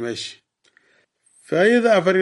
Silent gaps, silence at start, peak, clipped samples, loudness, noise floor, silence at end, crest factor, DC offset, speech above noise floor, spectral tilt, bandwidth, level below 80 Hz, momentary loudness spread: none; 0 s; -4 dBFS; under 0.1%; -18 LUFS; -61 dBFS; 0 s; 16 dB; under 0.1%; 44 dB; -5 dB/octave; 11.5 kHz; -72 dBFS; 15 LU